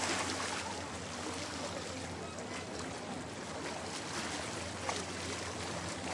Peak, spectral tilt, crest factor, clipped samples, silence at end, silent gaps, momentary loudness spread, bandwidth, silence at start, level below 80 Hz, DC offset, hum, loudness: -20 dBFS; -3 dB/octave; 20 dB; under 0.1%; 0 s; none; 5 LU; 11.5 kHz; 0 s; -66 dBFS; under 0.1%; none; -39 LUFS